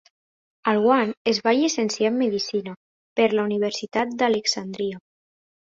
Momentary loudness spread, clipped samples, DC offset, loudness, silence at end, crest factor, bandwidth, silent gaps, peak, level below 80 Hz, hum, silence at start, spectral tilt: 10 LU; under 0.1%; under 0.1%; -23 LUFS; 0.75 s; 18 dB; 7.8 kHz; 1.17-1.25 s, 2.77-3.16 s; -6 dBFS; -66 dBFS; none; 0.65 s; -4 dB/octave